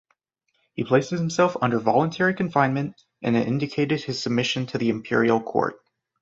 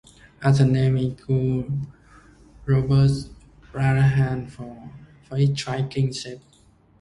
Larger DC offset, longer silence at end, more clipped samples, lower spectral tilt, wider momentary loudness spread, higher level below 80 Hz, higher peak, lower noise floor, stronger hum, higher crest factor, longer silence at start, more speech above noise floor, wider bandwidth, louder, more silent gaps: neither; second, 0.45 s vs 0.6 s; neither; second, -6 dB/octave vs -7.5 dB/octave; second, 7 LU vs 20 LU; second, -62 dBFS vs -46 dBFS; about the same, -4 dBFS vs -4 dBFS; first, -73 dBFS vs -56 dBFS; neither; about the same, 20 dB vs 18 dB; first, 0.75 s vs 0.4 s; first, 51 dB vs 35 dB; second, 7.8 kHz vs 11 kHz; about the same, -23 LUFS vs -22 LUFS; neither